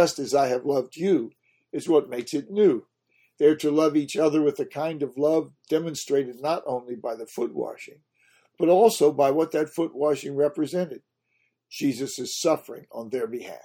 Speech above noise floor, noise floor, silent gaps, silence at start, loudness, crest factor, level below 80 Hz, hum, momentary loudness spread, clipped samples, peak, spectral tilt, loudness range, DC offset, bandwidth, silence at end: 48 dB; -72 dBFS; none; 0 s; -25 LUFS; 20 dB; -74 dBFS; none; 12 LU; under 0.1%; -4 dBFS; -5 dB/octave; 5 LU; under 0.1%; 17.5 kHz; 0.05 s